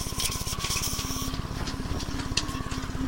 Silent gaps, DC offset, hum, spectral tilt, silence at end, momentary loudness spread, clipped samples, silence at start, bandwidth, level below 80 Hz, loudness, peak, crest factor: none; under 0.1%; none; -3 dB/octave; 0 s; 6 LU; under 0.1%; 0 s; 16.5 kHz; -36 dBFS; -30 LUFS; -8 dBFS; 22 dB